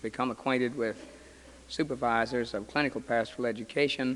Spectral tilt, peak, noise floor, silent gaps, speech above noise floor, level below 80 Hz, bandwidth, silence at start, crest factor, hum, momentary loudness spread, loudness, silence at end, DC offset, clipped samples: -5 dB/octave; -12 dBFS; -52 dBFS; none; 22 dB; -60 dBFS; 11.5 kHz; 0 s; 20 dB; none; 6 LU; -31 LUFS; 0 s; under 0.1%; under 0.1%